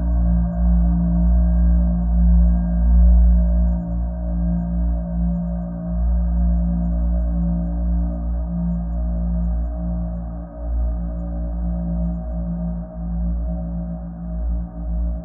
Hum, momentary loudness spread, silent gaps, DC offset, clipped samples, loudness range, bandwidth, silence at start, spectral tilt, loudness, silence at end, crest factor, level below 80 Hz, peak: 60 Hz at -30 dBFS; 10 LU; none; under 0.1%; under 0.1%; 8 LU; 1.7 kHz; 0 s; -15 dB/octave; -22 LUFS; 0 s; 12 dB; -20 dBFS; -6 dBFS